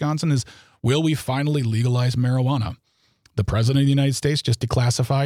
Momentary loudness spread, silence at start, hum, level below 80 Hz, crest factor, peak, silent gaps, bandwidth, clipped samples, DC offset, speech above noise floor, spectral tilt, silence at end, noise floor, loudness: 8 LU; 0 s; none; -44 dBFS; 14 dB; -8 dBFS; none; 15 kHz; under 0.1%; under 0.1%; 41 dB; -6 dB/octave; 0 s; -61 dBFS; -21 LUFS